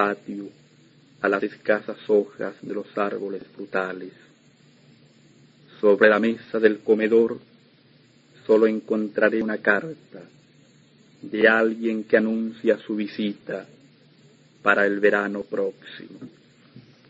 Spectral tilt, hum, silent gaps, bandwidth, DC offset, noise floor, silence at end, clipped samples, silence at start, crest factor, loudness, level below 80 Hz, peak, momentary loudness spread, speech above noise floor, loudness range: -7 dB/octave; none; none; 7.8 kHz; under 0.1%; -56 dBFS; 0.3 s; under 0.1%; 0 s; 22 dB; -22 LUFS; -72 dBFS; -2 dBFS; 19 LU; 34 dB; 5 LU